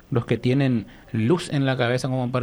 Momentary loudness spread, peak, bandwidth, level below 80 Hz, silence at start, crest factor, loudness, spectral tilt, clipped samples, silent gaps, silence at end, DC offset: 5 LU; -8 dBFS; 11.5 kHz; -52 dBFS; 0.1 s; 14 dB; -23 LUFS; -7 dB/octave; under 0.1%; none; 0 s; under 0.1%